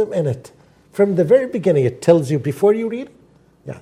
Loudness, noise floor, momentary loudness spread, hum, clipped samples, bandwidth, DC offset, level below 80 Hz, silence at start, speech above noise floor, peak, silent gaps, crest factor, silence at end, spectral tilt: -17 LUFS; -50 dBFS; 15 LU; none; under 0.1%; 14.5 kHz; under 0.1%; -60 dBFS; 0 s; 34 dB; 0 dBFS; none; 18 dB; 0 s; -7.5 dB/octave